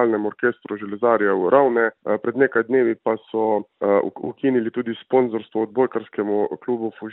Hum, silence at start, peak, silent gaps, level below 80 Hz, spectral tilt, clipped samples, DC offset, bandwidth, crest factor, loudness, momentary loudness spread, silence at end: none; 0 s; -2 dBFS; none; -70 dBFS; -11 dB/octave; under 0.1%; under 0.1%; 4 kHz; 18 dB; -21 LUFS; 9 LU; 0 s